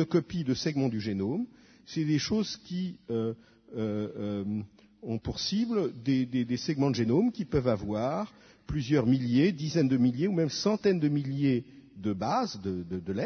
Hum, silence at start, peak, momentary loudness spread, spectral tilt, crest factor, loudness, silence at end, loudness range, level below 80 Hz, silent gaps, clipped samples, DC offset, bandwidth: none; 0 s; -12 dBFS; 10 LU; -6.5 dB/octave; 16 dB; -30 LUFS; 0 s; 6 LU; -56 dBFS; none; under 0.1%; under 0.1%; 6.6 kHz